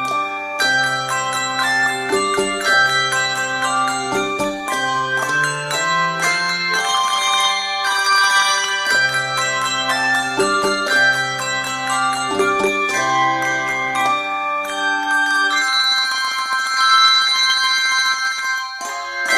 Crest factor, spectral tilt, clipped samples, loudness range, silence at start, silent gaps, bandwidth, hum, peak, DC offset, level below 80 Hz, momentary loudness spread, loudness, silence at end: 16 dB; -1 dB/octave; under 0.1%; 3 LU; 0 s; none; 16 kHz; none; -2 dBFS; under 0.1%; -56 dBFS; 7 LU; -16 LUFS; 0 s